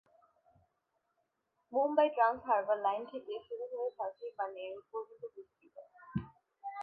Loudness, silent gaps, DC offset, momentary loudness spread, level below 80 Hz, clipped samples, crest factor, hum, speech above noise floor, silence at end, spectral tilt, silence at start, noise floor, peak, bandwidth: -35 LUFS; none; under 0.1%; 20 LU; -70 dBFS; under 0.1%; 22 dB; none; 46 dB; 0 s; -4.5 dB/octave; 1.7 s; -82 dBFS; -16 dBFS; 4.8 kHz